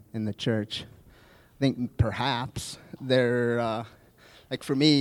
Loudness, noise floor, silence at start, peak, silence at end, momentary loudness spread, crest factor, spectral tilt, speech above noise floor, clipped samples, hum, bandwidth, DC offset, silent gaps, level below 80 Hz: -28 LUFS; -56 dBFS; 0.15 s; -8 dBFS; 0 s; 14 LU; 20 dB; -6 dB/octave; 29 dB; under 0.1%; none; 16 kHz; under 0.1%; none; -50 dBFS